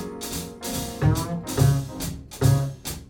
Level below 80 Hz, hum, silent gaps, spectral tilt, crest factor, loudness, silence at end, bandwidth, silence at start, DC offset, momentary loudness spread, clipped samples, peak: -38 dBFS; none; none; -5.5 dB/octave; 18 dB; -25 LUFS; 0 s; 17.5 kHz; 0 s; under 0.1%; 10 LU; under 0.1%; -6 dBFS